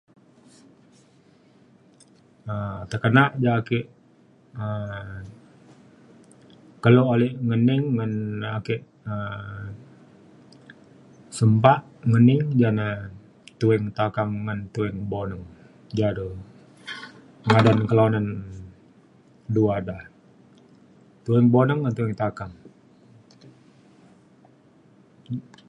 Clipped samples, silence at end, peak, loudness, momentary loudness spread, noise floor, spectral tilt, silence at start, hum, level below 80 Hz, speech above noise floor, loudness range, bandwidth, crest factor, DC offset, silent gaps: under 0.1%; 0.25 s; 0 dBFS; -23 LUFS; 21 LU; -56 dBFS; -8 dB/octave; 2.45 s; none; -54 dBFS; 35 dB; 9 LU; 10.5 kHz; 24 dB; under 0.1%; none